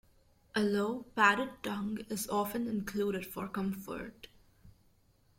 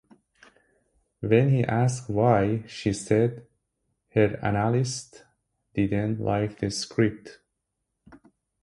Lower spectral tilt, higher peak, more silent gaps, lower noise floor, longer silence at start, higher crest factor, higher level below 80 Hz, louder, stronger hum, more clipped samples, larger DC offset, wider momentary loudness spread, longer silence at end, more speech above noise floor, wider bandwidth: second, -4.5 dB/octave vs -6.5 dB/octave; second, -12 dBFS vs -6 dBFS; neither; second, -68 dBFS vs -81 dBFS; second, 0.55 s vs 1.2 s; about the same, 24 dB vs 20 dB; second, -64 dBFS vs -52 dBFS; second, -34 LUFS vs -25 LUFS; neither; neither; neither; first, 12 LU vs 9 LU; first, 0.7 s vs 0.45 s; second, 34 dB vs 57 dB; first, 16.5 kHz vs 11.5 kHz